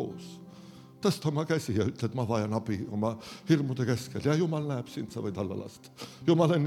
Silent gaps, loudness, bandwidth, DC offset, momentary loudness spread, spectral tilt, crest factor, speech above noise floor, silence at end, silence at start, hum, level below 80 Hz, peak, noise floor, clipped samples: none; -30 LUFS; 15.5 kHz; under 0.1%; 17 LU; -7 dB/octave; 20 dB; 21 dB; 0 s; 0 s; none; -64 dBFS; -10 dBFS; -50 dBFS; under 0.1%